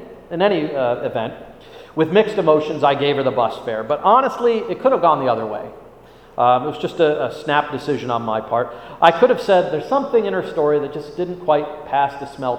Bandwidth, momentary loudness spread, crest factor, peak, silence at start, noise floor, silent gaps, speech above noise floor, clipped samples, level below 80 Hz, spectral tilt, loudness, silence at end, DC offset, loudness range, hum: 11 kHz; 11 LU; 18 dB; 0 dBFS; 0 s; -44 dBFS; none; 26 dB; under 0.1%; -54 dBFS; -6.5 dB/octave; -18 LUFS; 0 s; under 0.1%; 3 LU; none